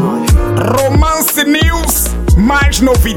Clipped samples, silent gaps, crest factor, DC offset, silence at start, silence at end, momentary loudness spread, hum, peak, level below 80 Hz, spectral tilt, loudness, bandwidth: under 0.1%; none; 10 dB; under 0.1%; 0 s; 0 s; 2 LU; none; 0 dBFS; -14 dBFS; -4.5 dB/octave; -11 LUFS; 17.5 kHz